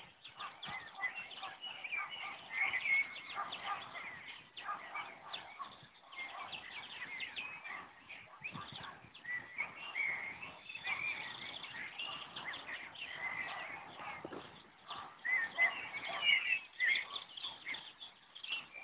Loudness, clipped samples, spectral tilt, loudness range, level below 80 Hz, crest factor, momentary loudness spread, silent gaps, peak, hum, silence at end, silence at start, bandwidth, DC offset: -39 LUFS; under 0.1%; 2 dB/octave; 11 LU; -80 dBFS; 24 dB; 17 LU; none; -18 dBFS; none; 0 s; 0 s; 4 kHz; under 0.1%